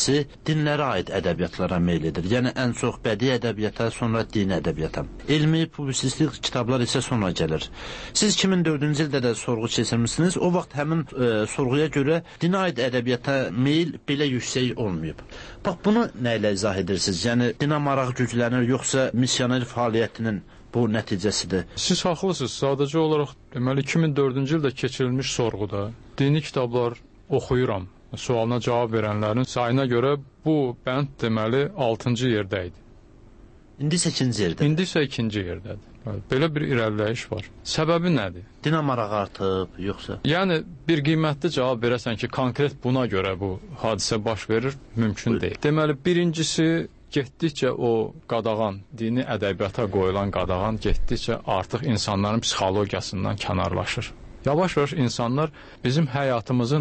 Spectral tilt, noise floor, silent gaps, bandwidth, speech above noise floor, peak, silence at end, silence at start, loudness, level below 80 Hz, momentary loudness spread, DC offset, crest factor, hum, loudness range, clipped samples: -5.5 dB/octave; -49 dBFS; none; 8.8 kHz; 25 dB; -10 dBFS; 0 s; 0 s; -24 LUFS; -44 dBFS; 7 LU; under 0.1%; 14 dB; none; 2 LU; under 0.1%